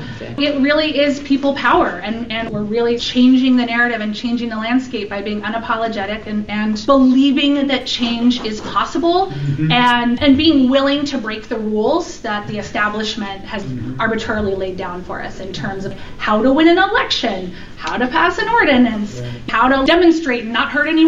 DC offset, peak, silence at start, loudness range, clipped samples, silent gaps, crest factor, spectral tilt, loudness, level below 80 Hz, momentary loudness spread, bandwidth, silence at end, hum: 0.9%; -2 dBFS; 0 s; 6 LU; under 0.1%; none; 14 dB; -5.5 dB/octave; -16 LUFS; -40 dBFS; 13 LU; 7.6 kHz; 0 s; none